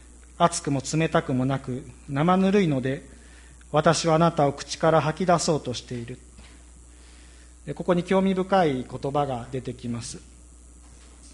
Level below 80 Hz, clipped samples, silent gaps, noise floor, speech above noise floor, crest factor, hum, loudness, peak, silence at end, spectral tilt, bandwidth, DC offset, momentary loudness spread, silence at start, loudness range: -48 dBFS; under 0.1%; none; -48 dBFS; 24 dB; 20 dB; none; -24 LUFS; -4 dBFS; 0.05 s; -5.5 dB/octave; 11.5 kHz; under 0.1%; 15 LU; 0.4 s; 5 LU